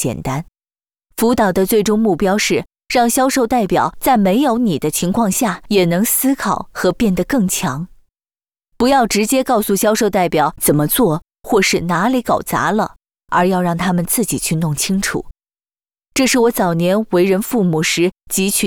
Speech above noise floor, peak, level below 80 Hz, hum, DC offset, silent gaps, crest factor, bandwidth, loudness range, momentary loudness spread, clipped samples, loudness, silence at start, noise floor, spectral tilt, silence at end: over 75 dB; -4 dBFS; -42 dBFS; none; 0.2%; none; 12 dB; over 20 kHz; 3 LU; 6 LU; under 0.1%; -16 LUFS; 0 s; under -90 dBFS; -4.5 dB/octave; 0 s